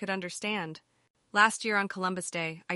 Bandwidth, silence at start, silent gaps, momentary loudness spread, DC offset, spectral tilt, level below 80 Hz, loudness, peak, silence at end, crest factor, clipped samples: 11.5 kHz; 0 s; 1.10-1.14 s; 10 LU; under 0.1%; -3 dB/octave; -80 dBFS; -29 LUFS; -8 dBFS; 0 s; 22 dB; under 0.1%